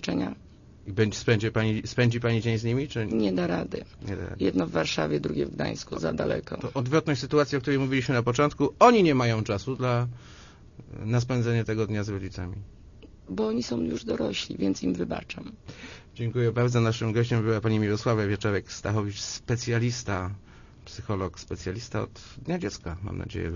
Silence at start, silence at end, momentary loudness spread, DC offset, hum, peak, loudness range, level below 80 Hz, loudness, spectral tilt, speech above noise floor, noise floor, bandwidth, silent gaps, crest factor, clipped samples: 0 s; 0 s; 13 LU; under 0.1%; none; -2 dBFS; 7 LU; -50 dBFS; -27 LUFS; -6 dB/octave; 24 dB; -50 dBFS; 7.4 kHz; none; 24 dB; under 0.1%